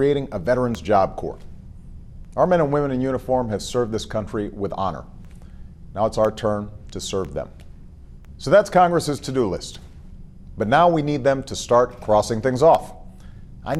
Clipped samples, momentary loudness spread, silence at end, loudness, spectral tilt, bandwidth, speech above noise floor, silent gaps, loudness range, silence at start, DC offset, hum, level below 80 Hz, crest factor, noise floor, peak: under 0.1%; 16 LU; 0 s; -21 LUFS; -6 dB/octave; 13.5 kHz; 21 dB; none; 7 LU; 0 s; under 0.1%; none; -40 dBFS; 18 dB; -41 dBFS; -4 dBFS